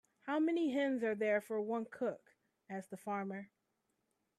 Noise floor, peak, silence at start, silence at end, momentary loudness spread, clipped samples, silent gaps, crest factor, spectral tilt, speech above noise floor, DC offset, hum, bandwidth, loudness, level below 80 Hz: -84 dBFS; -24 dBFS; 0.25 s; 0.95 s; 14 LU; under 0.1%; none; 16 dB; -6.5 dB/octave; 46 dB; under 0.1%; none; 13 kHz; -38 LUFS; -88 dBFS